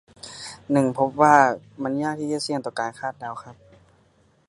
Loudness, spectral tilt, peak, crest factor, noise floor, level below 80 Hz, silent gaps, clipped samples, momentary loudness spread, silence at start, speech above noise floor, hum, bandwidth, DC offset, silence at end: -22 LUFS; -5 dB/octave; 0 dBFS; 22 dB; -60 dBFS; -66 dBFS; none; under 0.1%; 21 LU; 0.25 s; 38 dB; none; 11.5 kHz; under 0.1%; 0.95 s